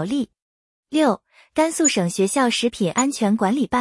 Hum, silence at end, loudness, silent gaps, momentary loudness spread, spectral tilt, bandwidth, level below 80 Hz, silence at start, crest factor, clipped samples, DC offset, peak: none; 0 s; -20 LUFS; 0.42-0.83 s; 8 LU; -4 dB/octave; 12 kHz; -58 dBFS; 0 s; 16 dB; under 0.1%; under 0.1%; -6 dBFS